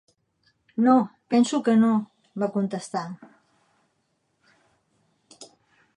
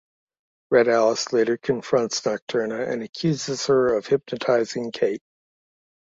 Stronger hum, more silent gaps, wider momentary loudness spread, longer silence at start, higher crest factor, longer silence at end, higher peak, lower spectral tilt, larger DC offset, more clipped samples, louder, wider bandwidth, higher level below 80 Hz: neither; second, none vs 2.42-2.47 s, 3.09-3.13 s; first, 17 LU vs 7 LU; about the same, 0.75 s vs 0.7 s; about the same, 20 dB vs 18 dB; second, 0.5 s vs 0.85 s; about the same, -8 dBFS vs -6 dBFS; first, -6 dB/octave vs -4.5 dB/octave; neither; neither; about the same, -23 LUFS vs -23 LUFS; first, 10.5 kHz vs 7.8 kHz; second, -80 dBFS vs -64 dBFS